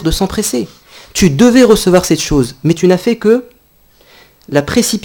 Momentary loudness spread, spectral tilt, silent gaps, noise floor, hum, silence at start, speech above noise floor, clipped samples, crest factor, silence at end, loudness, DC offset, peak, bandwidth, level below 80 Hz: 9 LU; -5 dB/octave; none; -48 dBFS; none; 0 s; 38 dB; 0.5%; 12 dB; 0.05 s; -11 LUFS; under 0.1%; 0 dBFS; 19 kHz; -30 dBFS